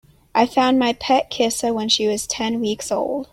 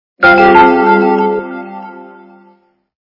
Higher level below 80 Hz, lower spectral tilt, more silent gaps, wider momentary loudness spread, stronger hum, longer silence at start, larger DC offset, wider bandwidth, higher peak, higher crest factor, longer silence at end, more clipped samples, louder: second, -54 dBFS vs -46 dBFS; second, -3 dB/octave vs -7.5 dB/octave; neither; second, 6 LU vs 23 LU; neither; first, 0.35 s vs 0.2 s; neither; first, 16 kHz vs 6 kHz; about the same, -2 dBFS vs 0 dBFS; first, 18 dB vs 12 dB; second, 0.05 s vs 1.1 s; second, under 0.1% vs 0.6%; second, -19 LUFS vs -8 LUFS